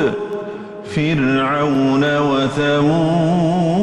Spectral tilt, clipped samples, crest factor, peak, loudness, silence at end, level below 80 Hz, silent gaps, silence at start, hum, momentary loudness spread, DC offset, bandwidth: -7 dB/octave; under 0.1%; 10 dB; -6 dBFS; -17 LUFS; 0 s; -48 dBFS; none; 0 s; none; 10 LU; under 0.1%; 10.5 kHz